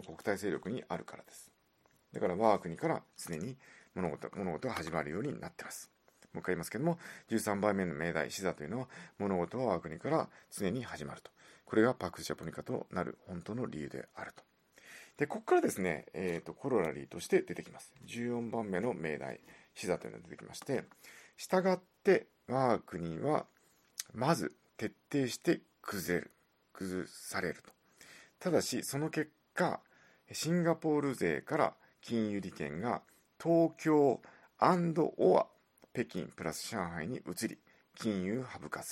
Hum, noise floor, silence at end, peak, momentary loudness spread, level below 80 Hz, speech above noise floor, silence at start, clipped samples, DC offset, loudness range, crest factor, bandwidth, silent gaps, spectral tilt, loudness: none; -72 dBFS; 0 s; -12 dBFS; 16 LU; -72 dBFS; 36 dB; 0 s; under 0.1%; under 0.1%; 7 LU; 24 dB; 16.5 kHz; none; -5.5 dB/octave; -36 LUFS